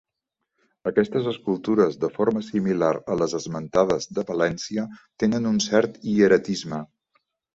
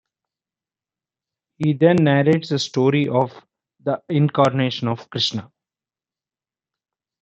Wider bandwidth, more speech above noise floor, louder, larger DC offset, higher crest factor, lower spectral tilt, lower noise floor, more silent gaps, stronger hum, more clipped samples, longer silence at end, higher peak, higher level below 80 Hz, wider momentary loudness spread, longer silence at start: about the same, 8 kHz vs 8.2 kHz; second, 60 dB vs over 72 dB; second, -23 LUFS vs -19 LUFS; neither; about the same, 20 dB vs 20 dB; about the same, -5.5 dB/octave vs -6.5 dB/octave; second, -82 dBFS vs under -90 dBFS; neither; neither; neither; second, 0.7 s vs 1.75 s; about the same, -4 dBFS vs -2 dBFS; first, -58 dBFS vs -66 dBFS; about the same, 9 LU vs 10 LU; second, 0.85 s vs 1.6 s